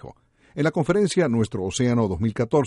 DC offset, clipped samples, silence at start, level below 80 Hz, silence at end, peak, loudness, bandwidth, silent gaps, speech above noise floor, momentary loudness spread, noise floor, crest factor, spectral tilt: under 0.1%; under 0.1%; 0.05 s; -50 dBFS; 0 s; -6 dBFS; -23 LUFS; 11.5 kHz; none; 24 dB; 5 LU; -45 dBFS; 16 dB; -6 dB/octave